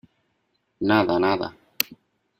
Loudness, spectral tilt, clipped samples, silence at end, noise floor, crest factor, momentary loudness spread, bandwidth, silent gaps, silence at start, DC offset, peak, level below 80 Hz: -23 LUFS; -4.5 dB/octave; under 0.1%; 0.45 s; -72 dBFS; 26 dB; 9 LU; 16.5 kHz; none; 0.8 s; under 0.1%; 0 dBFS; -62 dBFS